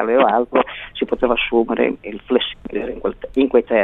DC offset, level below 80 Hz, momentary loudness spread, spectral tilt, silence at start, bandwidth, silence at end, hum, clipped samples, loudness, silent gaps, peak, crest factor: under 0.1%; -44 dBFS; 10 LU; -7.5 dB/octave; 0 s; 4.1 kHz; 0 s; none; under 0.1%; -19 LUFS; none; -2 dBFS; 16 dB